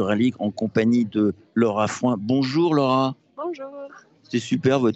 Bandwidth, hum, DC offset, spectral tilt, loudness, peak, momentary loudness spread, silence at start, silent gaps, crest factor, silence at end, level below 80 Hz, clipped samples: 8.2 kHz; none; under 0.1%; -6.5 dB/octave; -22 LUFS; -6 dBFS; 13 LU; 0 s; none; 16 dB; 0 s; -66 dBFS; under 0.1%